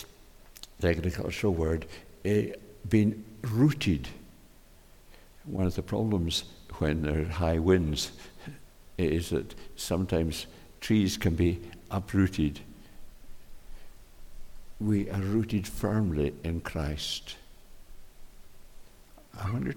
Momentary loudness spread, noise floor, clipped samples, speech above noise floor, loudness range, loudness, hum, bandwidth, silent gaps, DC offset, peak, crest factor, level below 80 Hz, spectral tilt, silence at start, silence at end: 19 LU; -54 dBFS; under 0.1%; 26 dB; 5 LU; -30 LUFS; none; 18.5 kHz; none; under 0.1%; -12 dBFS; 20 dB; -44 dBFS; -6 dB/octave; 0 s; 0 s